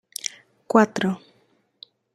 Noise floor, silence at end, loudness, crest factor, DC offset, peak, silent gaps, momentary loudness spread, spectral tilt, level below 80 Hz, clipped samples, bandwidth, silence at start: -64 dBFS; 0.95 s; -23 LUFS; 24 dB; under 0.1%; -2 dBFS; none; 14 LU; -4.5 dB/octave; -68 dBFS; under 0.1%; 15 kHz; 0.75 s